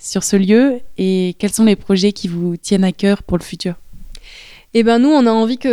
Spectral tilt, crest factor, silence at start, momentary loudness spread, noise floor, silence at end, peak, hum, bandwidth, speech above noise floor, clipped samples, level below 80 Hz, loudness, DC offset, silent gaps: -5.5 dB/octave; 14 dB; 0.05 s; 10 LU; -39 dBFS; 0 s; 0 dBFS; none; 14.5 kHz; 25 dB; under 0.1%; -42 dBFS; -15 LUFS; under 0.1%; none